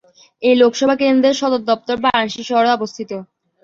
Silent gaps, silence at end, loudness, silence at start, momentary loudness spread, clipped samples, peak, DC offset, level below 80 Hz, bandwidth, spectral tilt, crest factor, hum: none; 0.4 s; -16 LUFS; 0.4 s; 12 LU; under 0.1%; -2 dBFS; under 0.1%; -58 dBFS; 7.6 kHz; -4 dB/octave; 14 dB; none